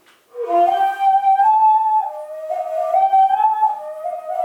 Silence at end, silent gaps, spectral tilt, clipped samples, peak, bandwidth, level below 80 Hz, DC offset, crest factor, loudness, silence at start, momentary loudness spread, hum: 0 s; none; -3.5 dB/octave; under 0.1%; -6 dBFS; 12.5 kHz; -72 dBFS; under 0.1%; 10 dB; -16 LUFS; 0.35 s; 14 LU; none